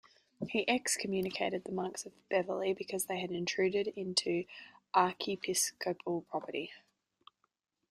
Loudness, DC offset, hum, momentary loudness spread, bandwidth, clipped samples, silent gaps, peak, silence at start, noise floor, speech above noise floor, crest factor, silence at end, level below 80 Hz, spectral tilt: -34 LUFS; under 0.1%; none; 9 LU; 15 kHz; under 0.1%; none; -14 dBFS; 0.4 s; -81 dBFS; 46 dB; 22 dB; 1.15 s; -76 dBFS; -3 dB/octave